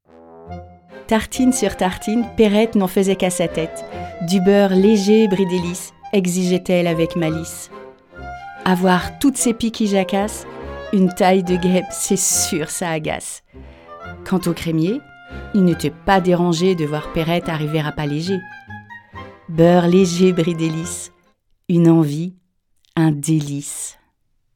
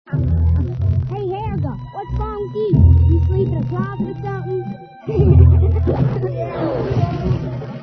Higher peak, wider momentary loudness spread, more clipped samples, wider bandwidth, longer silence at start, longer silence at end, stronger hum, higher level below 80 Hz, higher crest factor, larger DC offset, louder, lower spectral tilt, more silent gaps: about the same, 0 dBFS vs 0 dBFS; first, 20 LU vs 13 LU; neither; first, 18 kHz vs 4.7 kHz; first, 0.3 s vs 0.1 s; first, 0.65 s vs 0 s; neither; second, -44 dBFS vs -24 dBFS; about the same, 18 dB vs 16 dB; neither; about the same, -18 LUFS vs -18 LUFS; second, -5.5 dB/octave vs -11 dB/octave; neither